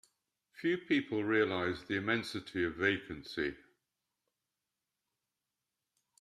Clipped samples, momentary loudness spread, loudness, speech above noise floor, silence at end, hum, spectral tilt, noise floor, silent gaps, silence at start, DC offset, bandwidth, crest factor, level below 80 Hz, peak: under 0.1%; 7 LU; -34 LUFS; 55 dB; 2.65 s; none; -5.5 dB/octave; -89 dBFS; none; 0.55 s; under 0.1%; 13 kHz; 22 dB; -70 dBFS; -16 dBFS